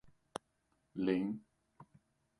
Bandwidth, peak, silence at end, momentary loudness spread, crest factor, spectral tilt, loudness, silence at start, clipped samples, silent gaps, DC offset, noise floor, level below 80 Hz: 11 kHz; -20 dBFS; 0.55 s; 15 LU; 22 dB; -7 dB/octave; -40 LUFS; 0.05 s; under 0.1%; none; under 0.1%; -79 dBFS; -74 dBFS